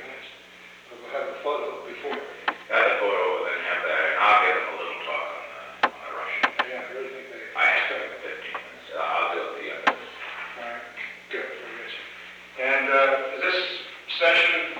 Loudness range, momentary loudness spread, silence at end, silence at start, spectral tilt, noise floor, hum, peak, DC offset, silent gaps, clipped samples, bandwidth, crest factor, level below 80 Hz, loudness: 7 LU; 17 LU; 0 s; 0 s; -2 dB/octave; -47 dBFS; 60 Hz at -70 dBFS; -6 dBFS; under 0.1%; none; under 0.1%; 19.5 kHz; 20 dB; -72 dBFS; -25 LUFS